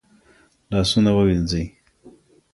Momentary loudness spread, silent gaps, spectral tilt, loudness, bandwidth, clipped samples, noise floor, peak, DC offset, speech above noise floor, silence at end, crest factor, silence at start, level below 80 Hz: 10 LU; none; -6 dB/octave; -20 LUFS; 11.5 kHz; under 0.1%; -57 dBFS; -6 dBFS; under 0.1%; 38 dB; 0.45 s; 16 dB; 0.7 s; -38 dBFS